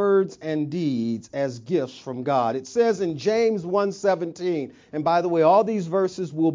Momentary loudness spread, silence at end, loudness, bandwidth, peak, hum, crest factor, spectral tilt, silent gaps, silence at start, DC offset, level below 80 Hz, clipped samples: 9 LU; 0 s; -23 LUFS; 7.6 kHz; -6 dBFS; none; 16 dB; -6.5 dB/octave; none; 0 s; under 0.1%; -66 dBFS; under 0.1%